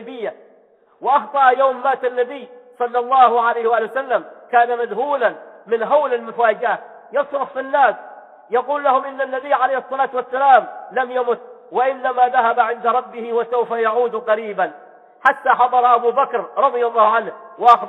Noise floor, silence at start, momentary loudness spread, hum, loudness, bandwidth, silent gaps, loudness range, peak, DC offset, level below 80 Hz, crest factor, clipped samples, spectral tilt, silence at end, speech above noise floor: -53 dBFS; 0 s; 10 LU; none; -18 LUFS; 5.4 kHz; none; 3 LU; 0 dBFS; under 0.1%; -76 dBFS; 18 dB; under 0.1%; -5 dB/octave; 0 s; 36 dB